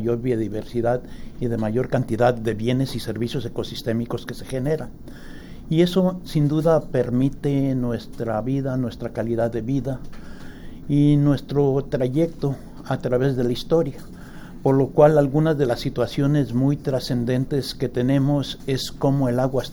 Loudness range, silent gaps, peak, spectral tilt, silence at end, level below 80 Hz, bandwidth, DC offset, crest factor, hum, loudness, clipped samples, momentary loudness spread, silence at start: 5 LU; none; -2 dBFS; -7.5 dB/octave; 0 s; -40 dBFS; over 20 kHz; under 0.1%; 18 dB; none; -22 LUFS; under 0.1%; 12 LU; 0 s